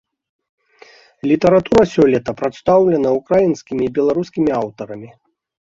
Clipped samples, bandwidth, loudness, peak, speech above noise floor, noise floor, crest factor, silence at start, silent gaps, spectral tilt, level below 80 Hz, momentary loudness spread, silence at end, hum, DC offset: under 0.1%; 7.8 kHz; -16 LUFS; 0 dBFS; 31 dB; -47 dBFS; 16 dB; 1.25 s; none; -7.5 dB/octave; -48 dBFS; 13 LU; 0.7 s; none; under 0.1%